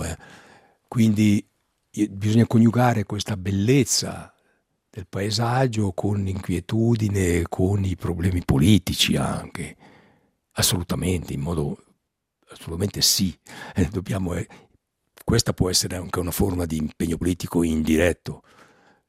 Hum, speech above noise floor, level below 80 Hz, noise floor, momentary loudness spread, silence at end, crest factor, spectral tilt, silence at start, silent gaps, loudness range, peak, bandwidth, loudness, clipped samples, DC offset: none; 53 dB; -44 dBFS; -75 dBFS; 16 LU; 0.7 s; 20 dB; -5 dB/octave; 0 s; none; 4 LU; -4 dBFS; 16 kHz; -22 LUFS; under 0.1%; under 0.1%